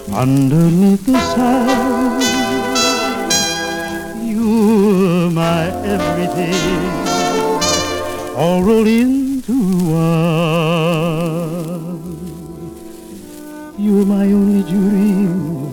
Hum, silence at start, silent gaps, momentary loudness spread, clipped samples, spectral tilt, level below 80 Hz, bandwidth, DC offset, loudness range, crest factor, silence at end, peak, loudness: none; 0 s; none; 15 LU; under 0.1%; -5.5 dB/octave; -40 dBFS; 18.5 kHz; under 0.1%; 5 LU; 14 dB; 0 s; -2 dBFS; -15 LUFS